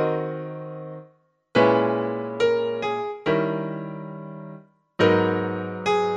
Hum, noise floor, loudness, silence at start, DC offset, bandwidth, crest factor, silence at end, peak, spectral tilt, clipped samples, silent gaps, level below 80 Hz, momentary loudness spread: none; -59 dBFS; -24 LUFS; 0 s; under 0.1%; 8.8 kHz; 18 dB; 0 s; -6 dBFS; -6.5 dB/octave; under 0.1%; none; -64 dBFS; 19 LU